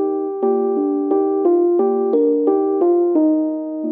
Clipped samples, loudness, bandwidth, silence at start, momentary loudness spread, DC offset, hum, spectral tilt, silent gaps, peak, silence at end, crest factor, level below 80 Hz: under 0.1%; -17 LUFS; 2.3 kHz; 0 s; 5 LU; under 0.1%; none; -12 dB/octave; none; -6 dBFS; 0 s; 10 dB; under -90 dBFS